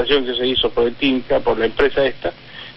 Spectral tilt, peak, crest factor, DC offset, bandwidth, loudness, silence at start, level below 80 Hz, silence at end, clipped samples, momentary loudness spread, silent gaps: -7 dB/octave; -2 dBFS; 16 dB; under 0.1%; 5.8 kHz; -18 LUFS; 0 s; -38 dBFS; 0.05 s; under 0.1%; 9 LU; none